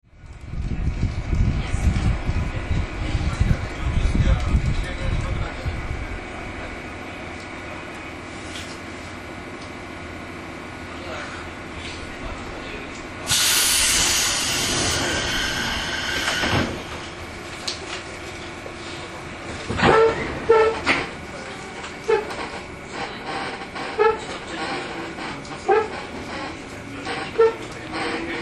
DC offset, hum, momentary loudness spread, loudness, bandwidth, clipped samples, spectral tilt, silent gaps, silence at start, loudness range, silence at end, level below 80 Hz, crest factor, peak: under 0.1%; none; 16 LU; -24 LUFS; 13 kHz; under 0.1%; -3.5 dB/octave; none; 0.15 s; 14 LU; 0 s; -32 dBFS; 22 dB; -2 dBFS